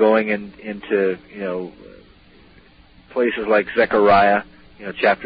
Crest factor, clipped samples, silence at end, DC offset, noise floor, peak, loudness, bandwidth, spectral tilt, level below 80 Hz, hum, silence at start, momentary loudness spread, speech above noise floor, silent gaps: 16 dB; under 0.1%; 0 s; under 0.1%; -49 dBFS; -4 dBFS; -19 LUFS; 5.2 kHz; -10 dB/octave; -52 dBFS; none; 0 s; 18 LU; 31 dB; none